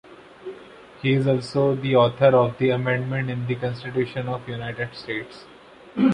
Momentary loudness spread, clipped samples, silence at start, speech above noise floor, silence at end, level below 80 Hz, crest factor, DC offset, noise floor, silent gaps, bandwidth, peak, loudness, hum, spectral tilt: 21 LU; under 0.1%; 0.1 s; 22 dB; 0 s; -58 dBFS; 18 dB; under 0.1%; -44 dBFS; none; 10 kHz; -4 dBFS; -23 LUFS; none; -8 dB/octave